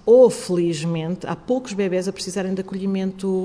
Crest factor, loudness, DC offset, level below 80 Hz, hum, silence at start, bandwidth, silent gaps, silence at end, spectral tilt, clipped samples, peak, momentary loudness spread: 16 dB; -22 LUFS; under 0.1%; -56 dBFS; none; 0.05 s; 11 kHz; none; 0 s; -6 dB/octave; under 0.1%; -4 dBFS; 11 LU